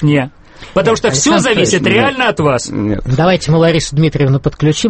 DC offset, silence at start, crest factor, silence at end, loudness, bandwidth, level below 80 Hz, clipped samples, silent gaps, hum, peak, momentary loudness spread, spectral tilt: under 0.1%; 0 s; 12 dB; 0 s; -12 LUFS; 8.8 kHz; -34 dBFS; under 0.1%; none; none; 0 dBFS; 5 LU; -5 dB/octave